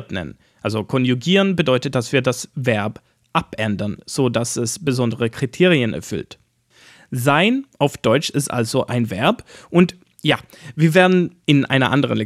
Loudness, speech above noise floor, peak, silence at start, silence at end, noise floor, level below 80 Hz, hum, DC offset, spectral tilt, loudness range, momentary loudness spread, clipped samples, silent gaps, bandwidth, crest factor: -19 LUFS; 34 dB; -2 dBFS; 0 s; 0 s; -52 dBFS; -56 dBFS; none; under 0.1%; -5.5 dB/octave; 3 LU; 11 LU; under 0.1%; none; 15 kHz; 18 dB